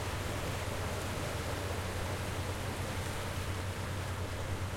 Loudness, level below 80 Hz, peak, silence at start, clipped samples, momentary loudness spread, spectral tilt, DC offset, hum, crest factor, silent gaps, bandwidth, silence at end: -37 LUFS; -48 dBFS; -24 dBFS; 0 s; under 0.1%; 1 LU; -4.5 dB/octave; under 0.1%; none; 12 dB; none; 16.5 kHz; 0 s